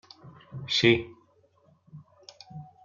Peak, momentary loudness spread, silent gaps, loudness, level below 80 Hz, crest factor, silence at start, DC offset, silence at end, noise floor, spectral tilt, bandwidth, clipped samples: -6 dBFS; 26 LU; none; -24 LUFS; -64 dBFS; 24 dB; 0.25 s; under 0.1%; 0.2 s; -64 dBFS; -5 dB/octave; 7.2 kHz; under 0.1%